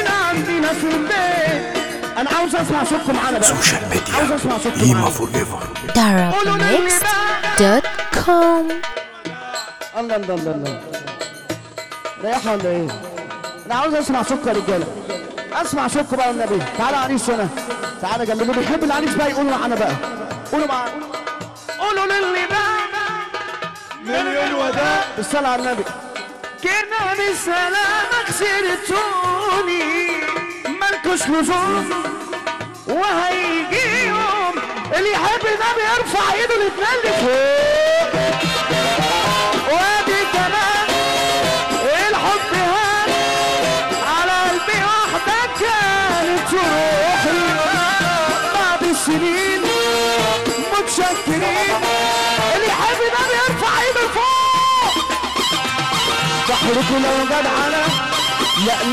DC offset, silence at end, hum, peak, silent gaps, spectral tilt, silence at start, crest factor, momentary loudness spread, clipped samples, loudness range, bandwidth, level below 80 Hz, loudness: 0.3%; 0 s; none; 0 dBFS; none; -3 dB/octave; 0 s; 18 dB; 10 LU; under 0.1%; 5 LU; 18 kHz; -46 dBFS; -17 LUFS